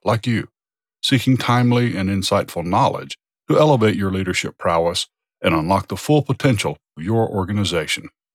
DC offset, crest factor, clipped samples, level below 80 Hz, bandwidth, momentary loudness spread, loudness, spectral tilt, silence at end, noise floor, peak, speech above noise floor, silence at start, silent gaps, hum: under 0.1%; 16 dB; under 0.1%; -50 dBFS; 16 kHz; 8 LU; -19 LUFS; -5.5 dB/octave; 0.25 s; under -90 dBFS; -4 dBFS; over 72 dB; 0.05 s; none; none